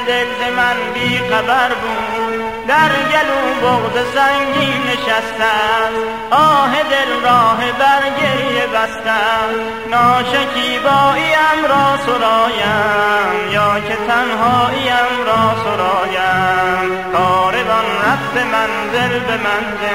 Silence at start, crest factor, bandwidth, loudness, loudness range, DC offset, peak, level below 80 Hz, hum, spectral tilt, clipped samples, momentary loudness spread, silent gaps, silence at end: 0 s; 14 dB; 16 kHz; -14 LUFS; 2 LU; 0.6%; -2 dBFS; -46 dBFS; none; -4 dB/octave; under 0.1%; 5 LU; none; 0 s